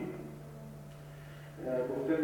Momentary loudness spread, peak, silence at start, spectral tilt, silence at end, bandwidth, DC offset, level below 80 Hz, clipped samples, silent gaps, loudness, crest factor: 15 LU; -20 dBFS; 0 s; -7.5 dB/octave; 0 s; 19 kHz; under 0.1%; -62 dBFS; under 0.1%; none; -40 LUFS; 18 dB